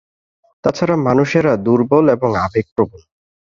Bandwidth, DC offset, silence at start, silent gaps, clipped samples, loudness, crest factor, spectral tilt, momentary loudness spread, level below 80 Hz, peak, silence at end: 7.4 kHz; under 0.1%; 0.65 s; 2.72-2.76 s; under 0.1%; -16 LUFS; 14 dB; -7.5 dB/octave; 8 LU; -46 dBFS; -2 dBFS; 0.55 s